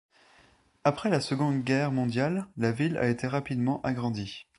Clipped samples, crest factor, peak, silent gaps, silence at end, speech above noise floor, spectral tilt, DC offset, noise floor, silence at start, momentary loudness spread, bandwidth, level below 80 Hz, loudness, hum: under 0.1%; 20 dB; -10 dBFS; none; 0.15 s; 34 dB; -6.5 dB/octave; under 0.1%; -62 dBFS; 0.85 s; 4 LU; 11.5 kHz; -60 dBFS; -29 LUFS; none